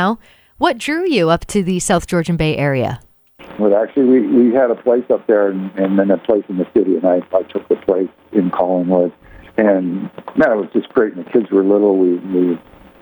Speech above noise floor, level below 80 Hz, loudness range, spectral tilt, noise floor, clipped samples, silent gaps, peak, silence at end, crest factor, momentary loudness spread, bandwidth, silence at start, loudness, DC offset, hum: 24 dB; -44 dBFS; 3 LU; -6 dB/octave; -39 dBFS; under 0.1%; none; 0 dBFS; 0.45 s; 14 dB; 7 LU; over 20 kHz; 0 s; -16 LUFS; under 0.1%; none